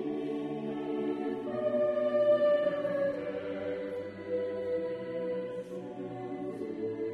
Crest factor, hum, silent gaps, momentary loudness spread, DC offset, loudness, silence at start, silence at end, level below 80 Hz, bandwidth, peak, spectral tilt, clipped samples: 16 dB; none; none; 12 LU; under 0.1%; -33 LUFS; 0 s; 0 s; -72 dBFS; 5.8 kHz; -16 dBFS; -7.5 dB/octave; under 0.1%